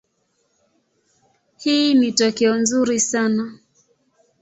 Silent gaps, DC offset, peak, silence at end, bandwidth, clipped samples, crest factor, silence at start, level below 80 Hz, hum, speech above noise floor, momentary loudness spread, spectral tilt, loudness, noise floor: none; under 0.1%; -4 dBFS; 0.85 s; 8.2 kHz; under 0.1%; 18 dB; 1.6 s; -64 dBFS; none; 50 dB; 8 LU; -3 dB/octave; -18 LUFS; -68 dBFS